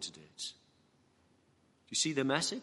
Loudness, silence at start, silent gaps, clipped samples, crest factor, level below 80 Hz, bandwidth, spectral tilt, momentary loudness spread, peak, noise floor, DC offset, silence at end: -35 LUFS; 0 s; none; under 0.1%; 24 dB; -82 dBFS; 11.5 kHz; -2.5 dB/octave; 13 LU; -14 dBFS; -70 dBFS; under 0.1%; 0 s